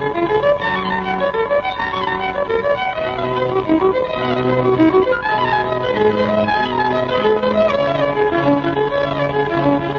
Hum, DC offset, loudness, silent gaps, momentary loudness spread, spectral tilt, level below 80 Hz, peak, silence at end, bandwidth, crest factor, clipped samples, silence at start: none; under 0.1%; -17 LUFS; none; 4 LU; -7.5 dB/octave; -44 dBFS; -4 dBFS; 0 s; 7 kHz; 14 dB; under 0.1%; 0 s